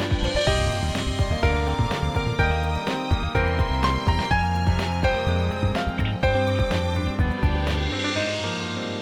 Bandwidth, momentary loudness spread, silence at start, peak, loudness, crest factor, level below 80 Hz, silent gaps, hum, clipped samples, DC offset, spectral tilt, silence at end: 13 kHz; 3 LU; 0 s; -8 dBFS; -24 LUFS; 14 dB; -30 dBFS; none; none; under 0.1%; under 0.1%; -5.5 dB/octave; 0 s